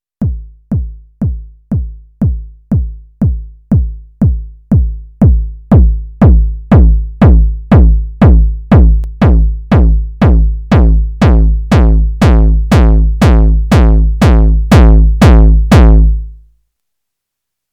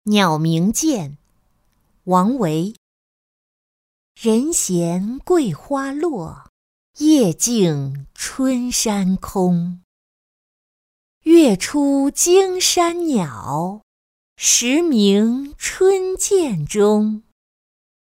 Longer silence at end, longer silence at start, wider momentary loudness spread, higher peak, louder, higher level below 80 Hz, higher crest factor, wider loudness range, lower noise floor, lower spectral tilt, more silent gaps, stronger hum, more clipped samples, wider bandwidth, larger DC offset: first, 1.4 s vs 1 s; first, 0.2 s vs 0.05 s; about the same, 12 LU vs 12 LU; about the same, 0 dBFS vs -2 dBFS; first, -10 LUFS vs -17 LUFS; first, -10 dBFS vs -50 dBFS; second, 8 dB vs 16 dB; first, 8 LU vs 5 LU; first, -77 dBFS vs -62 dBFS; first, -8.5 dB/octave vs -4.5 dB/octave; second, none vs 2.78-4.15 s, 6.49-6.94 s, 9.84-11.21 s, 13.83-14.36 s; neither; neither; second, 7.4 kHz vs 16 kHz; neither